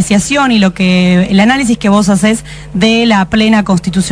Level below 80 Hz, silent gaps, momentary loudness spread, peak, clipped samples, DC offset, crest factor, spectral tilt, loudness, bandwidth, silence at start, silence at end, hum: -34 dBFS; none; 4 LU; 0 dBFS; 0.3%; 0.3%; 10 dB; -5 dB/octave; -9 LUFS; 11 kHz; 0 s; 0 s; none